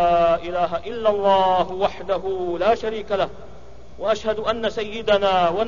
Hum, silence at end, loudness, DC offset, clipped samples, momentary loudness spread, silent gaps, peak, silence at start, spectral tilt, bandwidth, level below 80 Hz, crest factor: none; 0 s; -21 LUFS; 2%; under 0.1%; 8 LU; none; -6 dBFS; 0 s; -5.5 dB/octave; 7.4 kHz; -46 dBFS; 16 dB